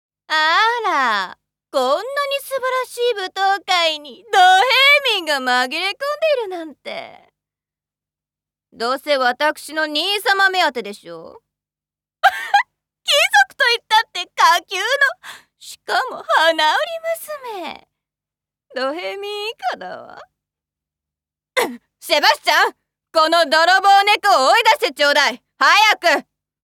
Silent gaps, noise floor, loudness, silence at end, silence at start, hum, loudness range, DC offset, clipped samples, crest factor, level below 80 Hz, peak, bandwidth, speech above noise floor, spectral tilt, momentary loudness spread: none; under -90 dBFS; -16 LUFS; 0.45 s; 0.3 s; 50 Hz at -75 dBFS; 12 LU; under 0.1%; under 0.1%; 18 dB; -72 dBFS; 0 dBFS; 18 kHz; over 73 dB; 0 dB/octave; 17 LU